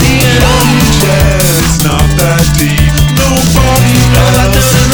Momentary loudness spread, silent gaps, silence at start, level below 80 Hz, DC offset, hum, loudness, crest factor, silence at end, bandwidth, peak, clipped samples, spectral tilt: 2 LU; none; 0 s; -14 dBFS; under 0.1%; none; -7 LUFS; 6 dB; 0 s; over 20 kHz; 0 dBFS; 1%; -4.5 dB/octave